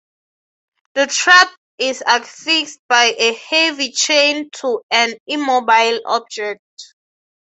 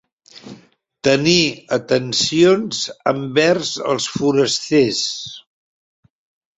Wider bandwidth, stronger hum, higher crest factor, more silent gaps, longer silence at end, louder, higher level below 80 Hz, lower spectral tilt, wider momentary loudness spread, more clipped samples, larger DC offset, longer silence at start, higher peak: about the same, 8.4 kHz vs 8.4 kHz; neither; about the same, 16 dB vs 18 dB; first, 1.57-1.78 s, 2.79-2.89 s, 4.83-4.89 s, 5.20-5.26 s, 6.59-6.77 s vs none; second, 0.75 s vs 1.2 s; about the same, -15 LUFS vs -17 LUFS; second, -70 dBFS vs -58 dBFS; second, 0.5 dB/octave vs -4 dB/octave; first, 12 LU vs 9 LU; neither; neither; first, 0.95 s vs 0.35 s; about the same, 0 dBFS vs -2 dBFS